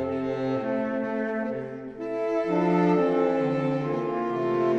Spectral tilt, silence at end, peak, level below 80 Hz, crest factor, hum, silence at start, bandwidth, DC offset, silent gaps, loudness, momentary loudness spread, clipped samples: -8.5 dB/octave; 0 s; -12 dBFS; -62 dBFS; 14 dB; none; 0 s; 7.8 kHz; under 0.1%; none; -26 LUFS; 9 LU; under 0.1%